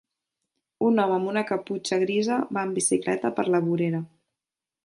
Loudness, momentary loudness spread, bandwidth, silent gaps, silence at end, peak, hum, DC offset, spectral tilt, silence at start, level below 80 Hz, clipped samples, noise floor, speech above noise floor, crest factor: -25 LUFS; 6 LU; 11.5 kHz; none; 0.8 s; -10 dBFS; none; under 0.1%; -5 dB/octave; 0.8 s; -72 dBFS; under 0.1%; -89 dBFS; 65 dB; 16 dB